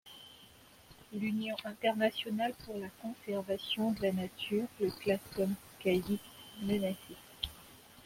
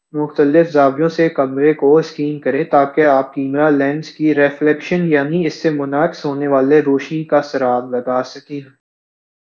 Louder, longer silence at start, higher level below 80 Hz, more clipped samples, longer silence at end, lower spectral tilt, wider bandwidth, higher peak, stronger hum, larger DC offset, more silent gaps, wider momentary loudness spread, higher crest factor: second, -36 LUFS vs -15 LUFS; about the same, 0.05 s vs 0.15 s; about the same, -64 dBFS vs -66 dBFS; neither; second, 0 s vs 0.75 s; second, -5.5 dB/octave vs -7.5 dB/octave; first, 16.5 kHz vs 7.2 kHz; second, -16 dBFS vs 0 dBFS; neither; neither; neither; first, 17 LU vs 8 LU; about the same, 20 dB vs 16 dB